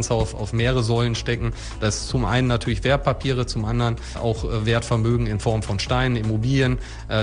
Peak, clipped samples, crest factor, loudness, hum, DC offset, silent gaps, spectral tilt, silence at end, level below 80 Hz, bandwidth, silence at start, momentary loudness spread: -6 dBFS; under 0.1%; 16 dB; -22 LUFS; none; under 0.1%; none; -5.5 dB/octave; 0 s; -32 dBFS; 10 kHz; 0 s; 5 LU